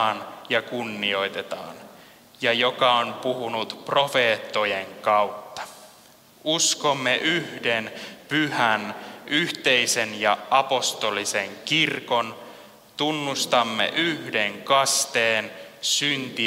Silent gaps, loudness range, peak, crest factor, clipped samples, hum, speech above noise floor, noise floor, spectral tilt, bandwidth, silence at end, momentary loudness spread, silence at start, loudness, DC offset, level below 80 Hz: none; 2 LU; -4 dBFS; 20 dB; under 0.1%; none; 28 dB; -52 dBFS; -2 dB/octave; 16 kHz; 0 s; 13 LU; 0 s; -23 LUFS; under 0.1%; -72 dBFS